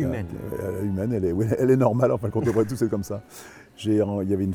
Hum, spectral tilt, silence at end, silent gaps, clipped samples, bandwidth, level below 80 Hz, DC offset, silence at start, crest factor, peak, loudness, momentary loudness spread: none; -8 dB/octave; 0 s; none; under 0.1%; 18 kHz; -52 dBFS; under 0.1%; 0 s; 18 dB; -6 dBFS; -24 LUFS; 13 LU